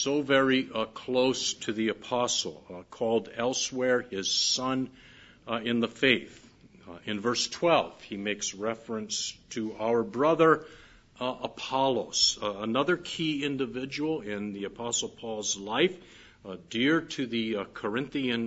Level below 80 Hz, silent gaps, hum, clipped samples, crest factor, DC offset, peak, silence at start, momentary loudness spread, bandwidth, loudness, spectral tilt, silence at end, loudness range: -66 dBFS; none; none; under 0.1%; 22 dB; under 0.1%; -6 dBFS; 0 s; 12 LU; 8 kHz; -29 LUFS; -3 dB/octave; 0 s; 4 LU